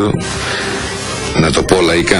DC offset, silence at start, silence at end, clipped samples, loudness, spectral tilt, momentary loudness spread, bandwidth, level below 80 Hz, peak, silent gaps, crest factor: under 0.1%; 0 s; 0 s; 0.1%; -14 LUFS; -4 dB/octave; 8 LU; 14.5 kHz; -30 dBFS; 0 dBFS; none; 14 dB